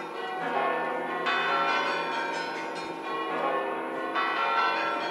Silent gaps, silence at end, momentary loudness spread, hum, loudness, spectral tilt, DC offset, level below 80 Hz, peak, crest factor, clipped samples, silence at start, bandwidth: none; 0 s; 8 LU; none; -28 LUFS; -3.5 dB/octave; under 0.1%; -82 dBFS; -14 dBFS; 16 dB; under 0.1%; 0 s; 15.5 kHz